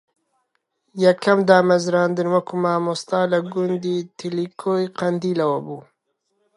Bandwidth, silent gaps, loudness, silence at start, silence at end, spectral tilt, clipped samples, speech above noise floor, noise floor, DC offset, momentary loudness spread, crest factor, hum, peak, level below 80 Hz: 11 kHz; none; -20 LUFS; 0.95 s; 0.75 s; -6 dB/octave; under 0.1%; 52 dB; -72 dBFS; under 0.1%; 12 LU; 20 dB; none; -2 dBFS; -70 dBFS